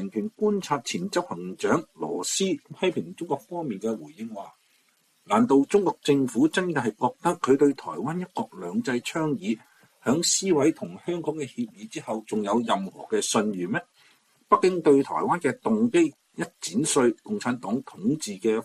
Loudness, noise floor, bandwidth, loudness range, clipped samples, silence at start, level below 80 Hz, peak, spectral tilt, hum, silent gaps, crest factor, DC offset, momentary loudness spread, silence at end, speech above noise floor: -26 LUFS; -66 dBFS; 14.5 kHz; 5 LU; under 0.1%; 0 s; -68 dBFS; -6 dBFS; -4.5 dB/octave; none; none; 20 dB; under 0.1%; 12 LU; 0 s; 41 dB